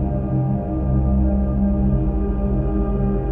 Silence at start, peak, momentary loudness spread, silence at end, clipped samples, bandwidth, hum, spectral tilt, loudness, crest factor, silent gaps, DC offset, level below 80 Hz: 0 s; -8 dBFS; 3 LU; 0 s; under 0.1%; 2.9 kHz; none; -13 dB/octave; -21 LUFS; 12 dB; none; under 0.1%; -22 dBFS